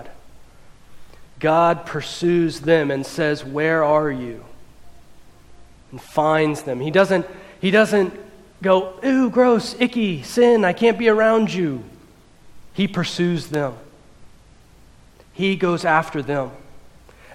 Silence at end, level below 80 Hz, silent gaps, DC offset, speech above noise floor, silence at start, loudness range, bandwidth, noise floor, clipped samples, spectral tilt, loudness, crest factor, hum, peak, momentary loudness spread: 0.55 s; -52 dBFS; none; under 0.1%; 30 dB; 0 s; 7 LU; 15 kHz; -48 dBFS; under 0.1%; -6 dB/octave; -19 LUFS; 18 dB; none; -2 dBFS; 10 LU